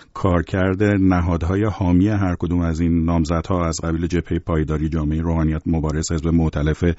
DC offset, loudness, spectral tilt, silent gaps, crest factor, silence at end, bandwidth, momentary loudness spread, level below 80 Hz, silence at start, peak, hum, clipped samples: under 0.1%; -20 LUFS; -7.5 dB/octave; none; 14 dB; 0 s; 8 kHz; 5 LU; -30 dBFS; 0.15 s; -4 dBFS; none; under 0.1%